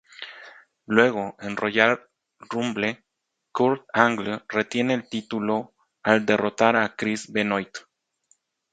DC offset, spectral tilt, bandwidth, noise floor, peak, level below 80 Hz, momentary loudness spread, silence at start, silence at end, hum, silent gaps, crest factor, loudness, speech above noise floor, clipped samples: under 0.1%; -5 dB/octave; 9.2 kHz; -80 dBFS; 0 dBFS; -66 dBFS; 17 LU; 0.2 s; 0.95 s; none; none; 24 dB; -23 LUFS; 57 dB; under 0.1%